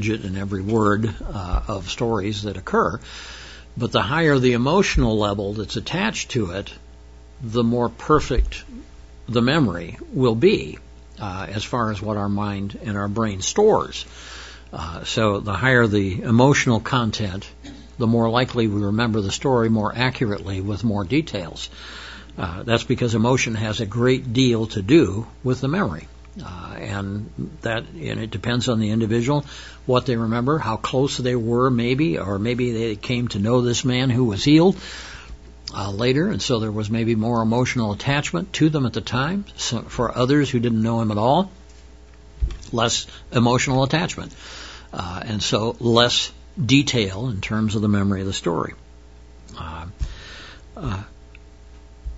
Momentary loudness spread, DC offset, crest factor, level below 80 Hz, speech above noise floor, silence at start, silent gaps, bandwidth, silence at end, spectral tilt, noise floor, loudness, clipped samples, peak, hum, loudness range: 17 LU; 0.2%; 22 dB; -38 dBFS; 24 dB; 0 s; none; 8 kHz; 0 s; -5.5 dB/octave; -45 dBFS; -21 LUFS; under 0.1%; 0 dBFS; none; 4 LU